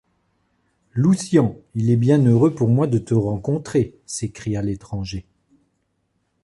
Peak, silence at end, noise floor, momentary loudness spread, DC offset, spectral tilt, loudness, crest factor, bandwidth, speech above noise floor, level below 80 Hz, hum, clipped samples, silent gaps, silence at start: -4 dBFS; 1.25 s; -70 dBFS; 13 LU; under 0.1%; -7.5 dB/octave; -20 LUFS; 16 dB; 11.5 kHz; 51 dB; -48 dBFS; none; under 0.1%; none; 0.95 s